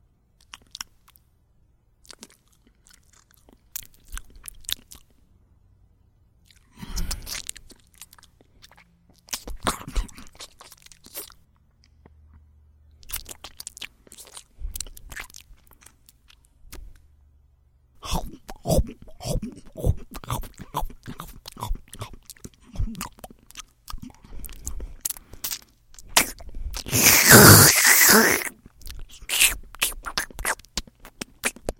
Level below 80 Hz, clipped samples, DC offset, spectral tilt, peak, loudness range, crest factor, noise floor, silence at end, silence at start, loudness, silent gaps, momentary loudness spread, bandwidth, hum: -38 dBFS; under 0.1%; under 0.1%; -2.5 dB/octave; 0 dBFS; 26 LU; 26 dB; -61 dBFS; 0.1 s; 4.1 s; -19 LUFS; none; 28 LU; 17 kHz; none